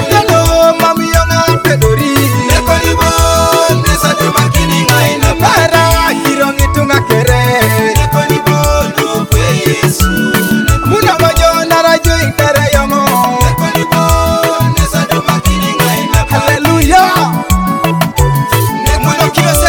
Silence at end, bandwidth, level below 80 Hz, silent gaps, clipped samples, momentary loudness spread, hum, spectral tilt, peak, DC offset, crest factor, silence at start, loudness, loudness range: 0 s; over 20 kHz; -18 dBFS; none; 0.5%; 4 LU; none; -4.5 dB/octave; 0 dBFS; under 0.1%; 10 dB; 0 s; -9 LUFS; 1 LU